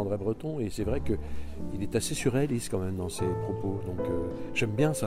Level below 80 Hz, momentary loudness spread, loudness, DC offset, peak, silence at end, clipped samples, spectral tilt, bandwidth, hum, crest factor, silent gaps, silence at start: -44 dBFS; 6 LU; -31 LUFS; under 0.1%; -12 dBFS; 0 s; under 0.1%; -6 dB/octave; 16 kHz; none; 18 dB; none; 0 s